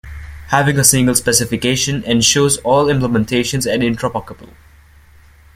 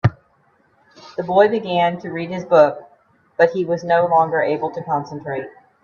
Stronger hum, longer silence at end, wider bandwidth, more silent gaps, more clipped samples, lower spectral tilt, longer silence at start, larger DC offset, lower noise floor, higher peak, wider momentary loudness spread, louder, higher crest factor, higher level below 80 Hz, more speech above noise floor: neither; first, 1.1 s vs 0.35 s; first, 16.5 kHz vs 7 kHz; neither; neither; second, -3.5 dB/octave vs -7.5 dB/octave; about the same, 0.05 s vs 0.05 s; neither; second, -45 dBFS vs -59 dBFS; about the same, 0 dBFS vs 0 dBFS; second, 10 LU vs 14 LU; first, -14 LUFS vs -18 LUFS; about the same, 16 dB vs 18 dB; first, -40 dBFS vs -54 dBFS; second, 30 dB vs 41 dB